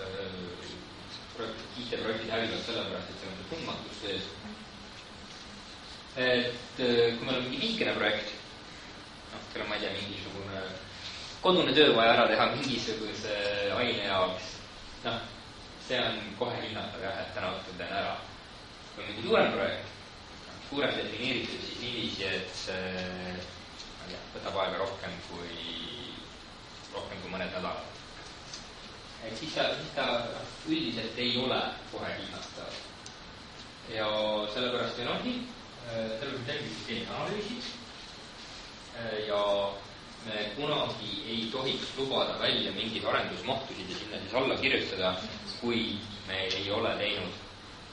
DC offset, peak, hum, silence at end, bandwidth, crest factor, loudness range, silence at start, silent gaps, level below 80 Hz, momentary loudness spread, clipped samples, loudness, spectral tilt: under 0.1%; -8 dBFS; none; 0 s; 11 kHz; 26 dB; 10 LU; 0 s; none; -58 dBFS; 17 LU; under 0.1%; -32 LUFS; -4 dB/octave